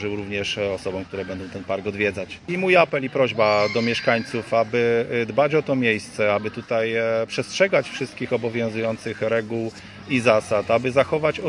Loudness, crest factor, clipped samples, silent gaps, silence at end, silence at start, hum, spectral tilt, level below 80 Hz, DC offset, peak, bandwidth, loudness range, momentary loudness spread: -22 LUFS; 20 dB; under 0.1%; none; 0 s; 0 s; none; -5.5 dB/octave; -60 dBFS; under 0.1%; -2 dBFS; 11.5 kHz; 3 LU; 10 LU